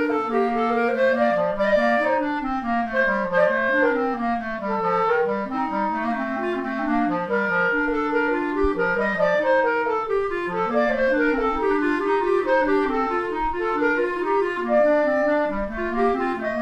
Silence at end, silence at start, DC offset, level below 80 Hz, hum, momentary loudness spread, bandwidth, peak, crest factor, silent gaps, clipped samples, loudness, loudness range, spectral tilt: 0 s; 0 s; under 0.1%; -44 dBFS; none; 6 LU; 9.2 kHz; -8 dBFS; 14 dB; none; under 0.1%; -22 LUFS; 2 LU; -6.5 dB/octave